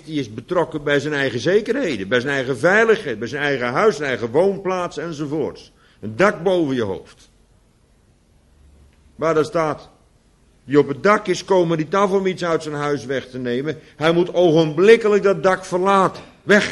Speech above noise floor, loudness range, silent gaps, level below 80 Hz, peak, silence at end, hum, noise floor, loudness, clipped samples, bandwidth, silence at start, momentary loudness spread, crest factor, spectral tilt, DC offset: 38 dB; 8 LU; none; -54 dBFS; 0 dBFS; 0 s; none; -56 dBFS; -19 LUFS; under 0.1%; 11.5 kHz; 0.05 s; 10 LU; 20 dB; -5.5 dB/octave; under 0.1%